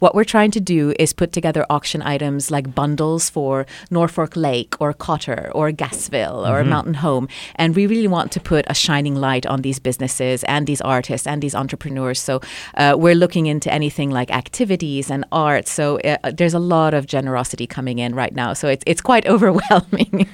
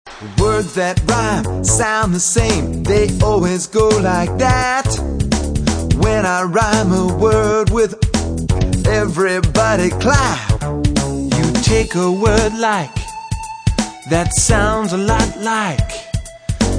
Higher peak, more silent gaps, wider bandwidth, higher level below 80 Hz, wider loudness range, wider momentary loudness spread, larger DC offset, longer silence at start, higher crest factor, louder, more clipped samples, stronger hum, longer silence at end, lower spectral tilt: about the same, 0 dBFS vs 0 dBFS; neither; first, 16.5 kHz vs 10.5 kHz; second, -46 dBFS vs -24 dBFS; about the same, 3 LU vs 2 LU; about the same, 8 LU vs 6 LU; neither; about the same, 0 s vs 0.05 s; about the same, 18 dB vs 16 dB; about the same, -18 LUFS vs -16 LUFS; neither; neither; about the same, 0 s vs 0 s; about the same, -5 dB/octave vs -5 dB/octave